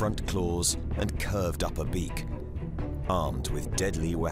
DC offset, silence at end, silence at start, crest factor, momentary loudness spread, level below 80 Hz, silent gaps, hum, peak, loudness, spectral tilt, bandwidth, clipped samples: under 0.1%; 0 s; 0 s; 16 dB; 8 LU; -36 dBFS; none; none; -12 dBFS; -31 LUFS; -5 dB/octave; 16 kHz; under 0.1%